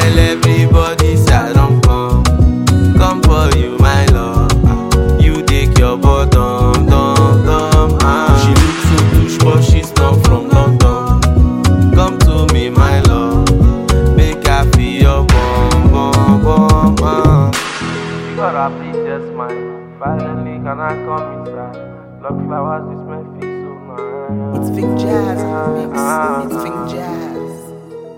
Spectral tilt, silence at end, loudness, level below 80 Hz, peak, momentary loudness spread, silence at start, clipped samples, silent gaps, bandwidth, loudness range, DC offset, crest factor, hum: -6.5 dB/octave; 0 s; -12 LUFS; -16 dBFS; 0 dBFS; 14 LU; 0 s; under 0.1%; none; 16 kHz; 11 LU; under 0.1%; 10 dB; none